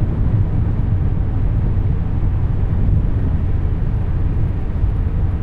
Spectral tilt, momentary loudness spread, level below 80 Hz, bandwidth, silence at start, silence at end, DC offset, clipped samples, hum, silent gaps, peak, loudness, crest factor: -11 dB/octave; 3 LU; -20 dBFS; 3.9 kHz; 0 s; 0 s; under 0.1%; under 0.1%; none; none; -4 dBFS; -20 LUFS; 12 dB